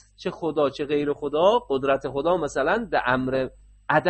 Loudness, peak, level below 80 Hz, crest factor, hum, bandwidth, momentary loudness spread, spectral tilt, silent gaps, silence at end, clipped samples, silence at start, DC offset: -24 LUFS; -6 dBFS; -52 dBFS; 18 dB; none; 8.4 kHz; 8 LU; -6 dB/octave; none; 0 s; under 0.1%; 0.2 s; under 0.1%